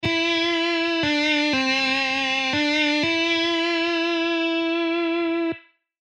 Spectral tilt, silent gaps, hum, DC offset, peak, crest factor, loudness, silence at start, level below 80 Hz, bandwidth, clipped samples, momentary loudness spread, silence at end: -3.5 dB/octave; none; none; under 0.1%; -10 dBFS; 12 dB; -21 LUFS; 0 s; -60 dBFS; 9 kHz; under 0.1%; 3 LU; 0.4 s